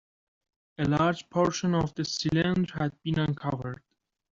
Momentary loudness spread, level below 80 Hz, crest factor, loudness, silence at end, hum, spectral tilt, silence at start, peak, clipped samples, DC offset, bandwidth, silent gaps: 7 LU; -56 dBFS; 18 dB; -28 LUFS; 0.6 s; none; -6 dB/octave; 0.8 s; -10 dBFS; under 0.1%; under 0.1%; 7.6 kHz; none